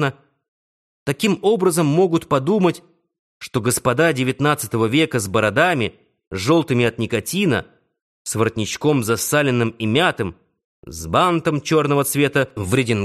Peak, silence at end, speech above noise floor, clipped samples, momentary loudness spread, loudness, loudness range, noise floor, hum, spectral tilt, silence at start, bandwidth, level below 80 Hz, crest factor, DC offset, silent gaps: -2 dBFS; 0 s; over 72 dB; under 0.1%; 10 LU; -19 LUFS; 2 LU; under -90 dBFS; none; -5 dB/octave; 0 s; 13 kHz; -52 dBFS; 16 dB; under 0.1%; 0.48-1.06 s, 3.19-3.40 s, 6.27-6.31 s, 8.02-8.25 s, 10.64-10.83 s